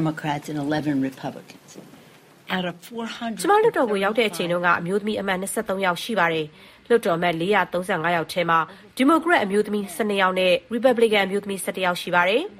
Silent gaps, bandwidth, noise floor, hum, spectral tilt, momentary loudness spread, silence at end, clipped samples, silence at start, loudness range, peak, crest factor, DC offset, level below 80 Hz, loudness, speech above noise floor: none; 16 kHz; -50 dBFS; none; -4.5 dB/octave; 10 LU; 0 s; under 0.1%; 0 s; 5 LU; -6 dBFS; 18 dB; under 0.1%; -62 dBFS; -22 LUFS; 28 dB